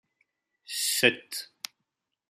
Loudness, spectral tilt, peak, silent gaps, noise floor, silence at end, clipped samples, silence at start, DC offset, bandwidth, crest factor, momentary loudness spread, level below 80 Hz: -26 LUFS; -1 dB/octave; -6 dBFS; none; -83 dBFS; 0.85 s; under 0.1%; 0.7 s; under 0.1%; 15.5 kHz; 26 dB; 19 LU; -80 dBFS